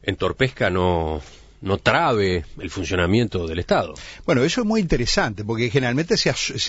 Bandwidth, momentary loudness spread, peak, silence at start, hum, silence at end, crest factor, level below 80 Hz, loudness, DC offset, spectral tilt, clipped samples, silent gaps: 8 kHz; 9 LU; -2 dBFS; 0.05 s; none; 0 s; 18 dB; -38 dBFS; -21 LUFS; under 0.1%; -5 dB/octave; under 0.1%; none